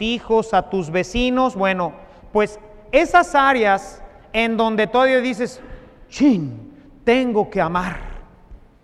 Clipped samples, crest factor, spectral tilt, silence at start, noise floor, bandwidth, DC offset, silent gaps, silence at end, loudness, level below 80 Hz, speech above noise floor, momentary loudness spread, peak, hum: under 0.1%; 18 dB; -5.5 dB/octave; 0 s; -44 dBFS; 12 kHz; under 0.1%; none; 0.3 s; -19 LUFS; -40 dBFS; 26 dB; 13 LU; -2 dBFS; none